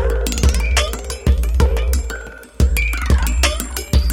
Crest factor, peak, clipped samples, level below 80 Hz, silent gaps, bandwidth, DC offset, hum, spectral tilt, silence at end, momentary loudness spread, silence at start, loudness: 14 dB; -2 dBFS; under 0.1%; -18 dBFS; none; 17 kHz; under 0.1%; none; -4.5 dB/octave; 0 s; 7 LU; 0 s; -18 LUFS